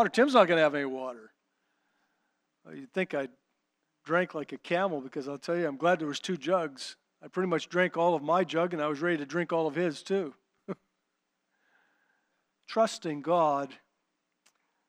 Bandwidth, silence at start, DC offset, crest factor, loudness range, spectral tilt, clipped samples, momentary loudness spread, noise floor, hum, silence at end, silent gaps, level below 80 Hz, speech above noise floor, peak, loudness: 11.5 kHz; 0 s; under 0.1%; 24 dB; 7 LU; -5.5 dB/octave; under 0.1%; 16 LU; -81 dBFS; none; 1.15 s; none; -90 dBFS; 52 dB; -6 dBFS; -29 LUFS